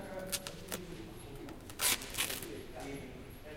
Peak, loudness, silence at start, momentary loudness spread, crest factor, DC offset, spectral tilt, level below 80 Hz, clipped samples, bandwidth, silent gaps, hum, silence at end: -14 dBFS; -38 LUFS; 0 s; 17 LU; 26 dB; under 0.1%; -1.5 dB/octave; -54 dBFS; under 0.1%; 17 kHz; none; none; 0 s